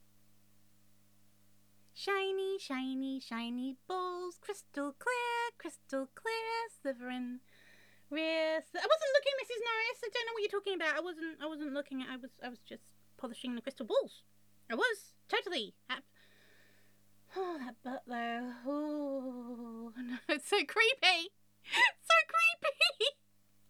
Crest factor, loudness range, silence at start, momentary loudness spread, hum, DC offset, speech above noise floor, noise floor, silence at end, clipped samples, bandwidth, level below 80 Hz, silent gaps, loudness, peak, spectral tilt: 24 dB; 11 LU; 1.95 s; 17 LU; 50 Hz at -75 dBFS; under 0.1%; 36 dB; -72 dBFS; 0.55 s; under 0.1%; over 20 kHz; under -90 dBFS; none; -35 LUFS; -12 dBFS; -1.5 dB/octave